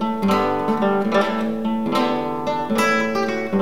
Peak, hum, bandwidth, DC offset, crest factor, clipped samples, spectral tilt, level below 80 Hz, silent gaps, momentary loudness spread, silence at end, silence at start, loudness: -6 dBFS; none; 16 kHz; 1%; 14 dB; under 0.1%; -5.5 dB/octave; -58 dBFS; none; 5 LU; 0 s; 0 s; -20 LUFS